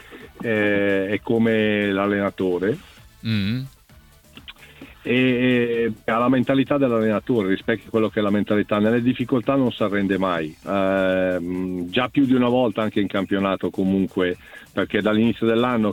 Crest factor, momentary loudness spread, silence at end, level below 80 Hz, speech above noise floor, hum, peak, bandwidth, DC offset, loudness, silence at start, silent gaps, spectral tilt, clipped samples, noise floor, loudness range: 16 dB; 8 LU; 0 s; -54 dBFS; 30 dB; none; -4 dBFS; 16 kHz; under 0.1%; -21 LUFS; 0.1 s; none; -7.5 dB/octave; under 0.1%; -50 dBFS; 3 LU